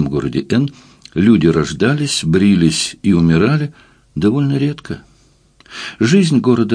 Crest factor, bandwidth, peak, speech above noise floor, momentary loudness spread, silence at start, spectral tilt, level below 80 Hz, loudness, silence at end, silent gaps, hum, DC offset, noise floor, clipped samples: 14 dB; 10.5 kHz; 0 dBFS; 38 dB; 16 LU; 0 s; -6 dB/octave; -42 dBFS; -14 LUFS; 0 s; none; none; under 0.1%; -51 dBFS; under 0.1%